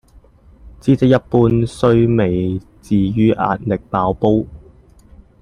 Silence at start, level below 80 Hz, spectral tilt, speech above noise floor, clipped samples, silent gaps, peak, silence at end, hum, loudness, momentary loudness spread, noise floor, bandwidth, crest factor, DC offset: 0.65 s; -40 dBFS; -8.5 dB/octave; 32 dB; under 0.1%; none; 0 dBFS; 0.85 s; none; -16 LUFS; 7 LU; -46 dBFS; 10.5 kHz; 16 dB; under 0.1%